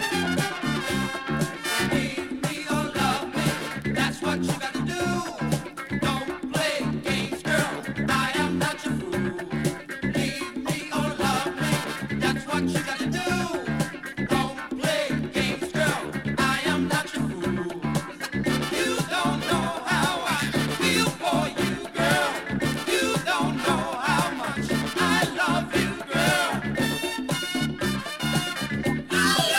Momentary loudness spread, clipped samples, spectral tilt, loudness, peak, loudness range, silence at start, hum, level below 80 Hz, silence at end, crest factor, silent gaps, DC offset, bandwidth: 6 LU; under 0.1%; -4 dB/octave; -25 LUFS; -8 dBFS; 3 LU; 0 s; none; -50 dBFS; 0 s; 16 dB; none; under 0.1%; 16.5 kHz